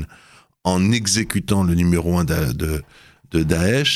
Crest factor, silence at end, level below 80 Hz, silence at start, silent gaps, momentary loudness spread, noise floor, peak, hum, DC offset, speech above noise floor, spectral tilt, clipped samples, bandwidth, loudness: 18 dB; 0 s; -38 dBFS; 0 s; none; 8 LU; -50 dBFS; 0 dBFS; none; under 0.1%; 32 dB; -5 dB/octave; under 0.1%; 15 kHz; -19 LUFS